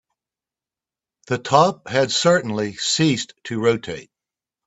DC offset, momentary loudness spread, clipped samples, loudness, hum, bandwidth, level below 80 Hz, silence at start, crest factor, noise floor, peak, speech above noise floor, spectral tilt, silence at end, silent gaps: under 0.1%; 11 LU; under 0.1%; -20 LUFS; none; 8.4 kHz; -60 dBFS; 1.3 s; 22 dB; -90 dBFS; 0 dBFS; 70 dB; -4 dB/octave; 0.65 s; none